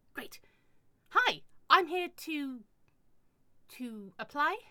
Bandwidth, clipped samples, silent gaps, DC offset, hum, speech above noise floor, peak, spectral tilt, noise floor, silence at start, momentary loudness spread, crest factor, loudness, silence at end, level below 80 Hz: 20 kHz; under 0.1%; none; under 0.1%; none; 29 dB; -10 dBFS; -2.5 dB/octave; -66 dBFS; 0.15 s; 19 LU; 26 dB; -31 LUFS; 0.1 s; -74 dBFS